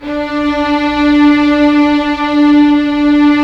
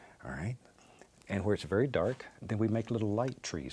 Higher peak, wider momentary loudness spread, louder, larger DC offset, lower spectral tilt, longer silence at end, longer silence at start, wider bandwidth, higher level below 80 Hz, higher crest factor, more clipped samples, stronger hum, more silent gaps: first, 0 dBFS vs -16 dBFS; second, 6 LU vs 10 LU; first, -10 LUFS vs -34 LUFS; neither; about the same, -5.5 dB/octave vs -6.5 dB/octave; about the same, 0 s vs 0 s; about the same, 0 s vs 0 s; second, 6.8 kHz vs 11 kHz; first, -36 dBFS vs -60 dBFS; second, 10 dB vs 18 dB; neither; neither; neither